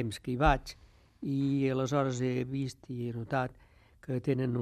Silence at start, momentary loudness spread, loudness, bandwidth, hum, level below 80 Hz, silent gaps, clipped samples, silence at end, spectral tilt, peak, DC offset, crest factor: 0 s; 11 LU; -32 LUFS; 13.5 kHz; none; -46 dBFS; none; under 0.1%; 0 s; -7 dB/octave; -12 dBFS; under 0.1%; 20 dB